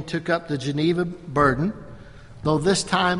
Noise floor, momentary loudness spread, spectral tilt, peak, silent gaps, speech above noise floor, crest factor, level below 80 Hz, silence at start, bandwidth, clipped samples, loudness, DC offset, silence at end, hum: -42 dBFS; 9 LU; -5 dB/octave; -6 dBFS; none; 20 dB; 18 dB; -46 dBFS; 0 s; 11.5 kHz; under 0.1%; -23 LUFS; under 0.1%; 0 s; none